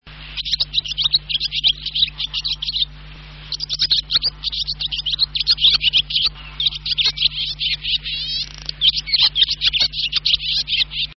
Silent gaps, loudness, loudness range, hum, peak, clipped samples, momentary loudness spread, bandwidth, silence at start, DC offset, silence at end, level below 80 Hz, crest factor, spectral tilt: none; -17 LUFS; 3 LU; none; -4 dBFS; under 0.1%; 8 LU; 6.2 kHz; 0.05 s; under 0.1%; 0.05 s; -40 dBFS; 16 dB; -1 dB/octave